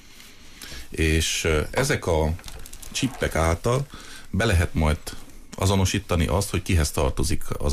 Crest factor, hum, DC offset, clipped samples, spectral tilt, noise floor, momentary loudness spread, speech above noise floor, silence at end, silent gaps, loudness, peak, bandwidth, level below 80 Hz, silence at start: 14 dB; none; under 0.1%; under 0.1%; -4.5 dB/octave; -44 dBFS; 17 LU; 22 dB; 0 s; none; -24 LUFS; -10 dBFS; 15.5 kHz; -32 dBFS; 0.05 s